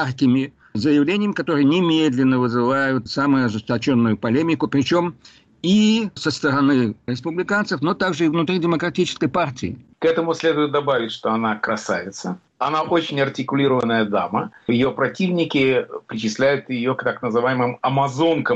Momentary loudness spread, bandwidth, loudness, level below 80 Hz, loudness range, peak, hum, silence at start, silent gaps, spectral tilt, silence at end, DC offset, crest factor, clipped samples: 7 LU; 8.2 kHz; -20 LUFS; -58 dBFS; 3 LU; -8 dBFS; none; 0 s; none; -6 dB/octave; 0 s; under 0.1%; 12 dB; under 0.1%